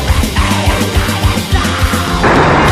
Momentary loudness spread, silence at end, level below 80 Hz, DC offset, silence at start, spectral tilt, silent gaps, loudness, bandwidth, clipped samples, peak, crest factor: 5 LU; 0 s; -18 dBFS; under 0.1%; 0 s; -5 dB/octave; none; -12 LUFS; 15.5 kHz; under 0.1%; 0 dBFS; 10 dB